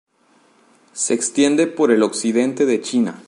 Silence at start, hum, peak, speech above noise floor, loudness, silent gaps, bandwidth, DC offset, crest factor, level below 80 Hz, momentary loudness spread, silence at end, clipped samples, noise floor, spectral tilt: 0.95 s; none; -2 dBFS; 39 dB; -18 LUFS; none; 11.5 kHz; under 0.1%; 16 dB; -70 dBFS; 5 LU; 0.1 s; under 0.1%; -57 dBFS; -3.5 dB/octave